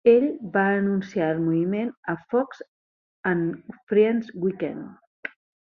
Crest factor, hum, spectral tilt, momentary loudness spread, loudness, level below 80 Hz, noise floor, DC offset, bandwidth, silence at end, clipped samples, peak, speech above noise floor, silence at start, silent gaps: 18 dB; none; -8.5 dB/octave; 17 LU; -24 LUFS; -68 dBFS; under -90 dBFS; under 0.1%; 6.4 kHz; 0.35 s; under 0.1%; -6 dBFS; over 67 dB; 0.05 s; 1.97-2.03 s, 2.68-3.23 s, 3.83-3.87 s, 5.07-5.23 s